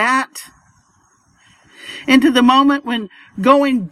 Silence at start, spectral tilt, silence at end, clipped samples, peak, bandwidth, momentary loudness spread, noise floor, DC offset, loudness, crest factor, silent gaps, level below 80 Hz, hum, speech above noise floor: 0 s; -4 dB/octave; 0.05 s; under 0.1%; 0 dBFS; 15 kHz; 21 LU; -56 dBFS; under 0.1%; -14 LUFS; 16 dB; none; -58 dBFS; none; 43 dB